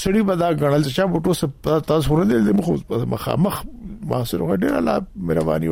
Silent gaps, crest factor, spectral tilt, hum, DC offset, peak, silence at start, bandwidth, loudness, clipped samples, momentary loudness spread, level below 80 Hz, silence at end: none; 14 dB; -7 dB/octave; none; under 0.1%; -6 dBFS; 0 s; 16.5 kHz; -20 LUFS; under 0.1%; 6 LU; -38 dBFS; 0 s